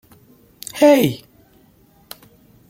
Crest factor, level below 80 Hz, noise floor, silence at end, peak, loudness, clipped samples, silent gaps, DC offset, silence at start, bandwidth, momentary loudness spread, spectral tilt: 20 dB; -60 dBFS; -53 dBFS; 1.55 s; -2 dBFS; -15 LUFS; under 0.1%; none; under 0.1%; 0.75 s; 16.5 kHz; 27 LU; -5.5 dB/octave